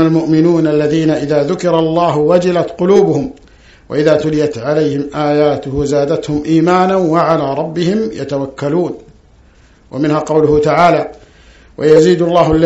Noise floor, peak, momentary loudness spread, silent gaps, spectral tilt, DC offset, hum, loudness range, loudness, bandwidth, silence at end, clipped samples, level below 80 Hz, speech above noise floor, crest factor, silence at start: -45 dBFS; 0 dBFS; 8 LU; none; -7 dB/octave; under 0.1%; none; 4 LU; -12 LUFS; 8.2 kHz; 0 s; 0.2%; -40 dBFS; 33 dB; 12 dB; 0 s